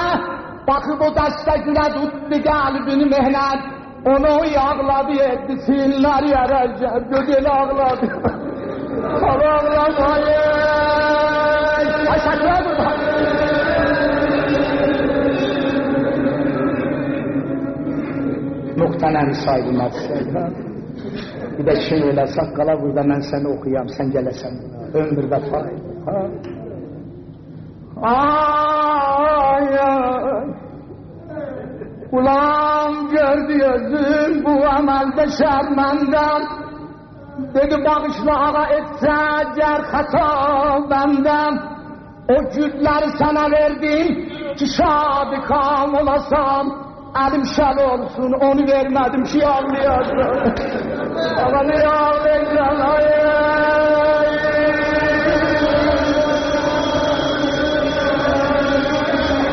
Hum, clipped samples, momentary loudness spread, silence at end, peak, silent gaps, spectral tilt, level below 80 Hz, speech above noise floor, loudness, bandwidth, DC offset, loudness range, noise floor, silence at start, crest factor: none; under 0.1%; 11 LU; 0 s; -4 dBFS; none; -4 dB/octave; -38 dBFS; 20 dB; -17 LUFS; 6.4 kHz; under 0.1%; 5 LU; -37 dBFS; 0 s; 12 dB